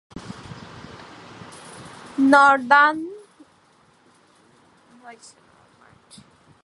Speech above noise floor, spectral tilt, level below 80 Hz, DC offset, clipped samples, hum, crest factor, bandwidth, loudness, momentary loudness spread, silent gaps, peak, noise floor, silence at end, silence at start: 41 dB; -4.5 dB/octave; -62 dBFS; under 0.1%; under 0.1%; none; 22 dB; 11.5 kHz; -16 LUFS; 27 LU; none; -2 dBFS; -57 dBFS; 1.55 s; 0.15 s